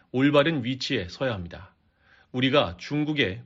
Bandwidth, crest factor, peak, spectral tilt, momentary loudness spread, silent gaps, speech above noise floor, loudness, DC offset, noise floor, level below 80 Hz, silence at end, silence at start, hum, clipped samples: 7.6 kHz; 20 dB; -6 dBFS; -4 dB/octave; 15 LU; none; 36 dB; -25 LUFS; under 0.1%; -60 dBFS; -56 dBFS; 0 s; 0.15 s; none; under 0.1%